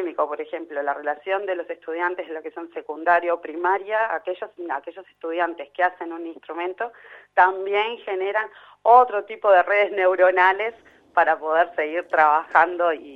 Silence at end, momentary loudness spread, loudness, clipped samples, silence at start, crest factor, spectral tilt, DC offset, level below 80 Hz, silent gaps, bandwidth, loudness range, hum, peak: 0 s; 15 LU; -22 LUFS; under 0.1%; 0 s; 20 dB; -4.5 dB/octave; under 0.1%; -74 dBFS; none; 5.8 kHz; 7 LU; 50 Hz at -75 dBFS; -2 dBFS